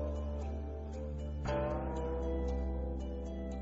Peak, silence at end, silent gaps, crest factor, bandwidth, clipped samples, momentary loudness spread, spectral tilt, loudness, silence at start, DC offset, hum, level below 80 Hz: -24 dBFS; 0 s; none; 12 dB; 7.6 kHz; under 0.1%; 6 LU; -8 dB/octave; -39 LUFS; 0 s; under 0.1%; none; -40 dBFS